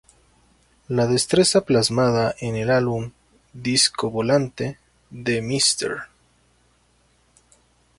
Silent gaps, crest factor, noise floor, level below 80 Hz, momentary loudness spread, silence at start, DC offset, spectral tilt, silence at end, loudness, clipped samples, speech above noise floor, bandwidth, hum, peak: none; 18 dB; -61 dBFS; -54 dBFS; 13 LU; 0.9 s; under 0.1%; -4 dB/octave; 1.95 s; -21 LUFS; under 0.1%; 41 dB; 11.5 kHz; 60 Hz at -45 dBFS; -6 dBFS